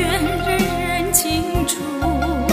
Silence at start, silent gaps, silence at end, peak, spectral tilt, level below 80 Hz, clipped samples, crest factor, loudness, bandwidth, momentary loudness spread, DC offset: 0 s; none; 0 s; 0 dBFS; -4 dB/octave; -30 dBFS; under 0.1%; 18 dB; -19 LUFS; 16 kHz; 5 LU; under 0.1%